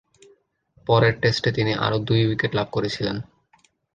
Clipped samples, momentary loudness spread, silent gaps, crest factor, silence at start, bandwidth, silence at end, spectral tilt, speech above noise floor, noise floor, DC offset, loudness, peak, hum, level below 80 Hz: under 0.1%; 9 LU; none; 20 dB; 0.85 s; 8.6 kHz; 0.75 s; -6.5 dB/octave; 40 dB; -61 dBFS; under 0.1%; -22 LUFS; -4 dBFS; none; -52 dBFS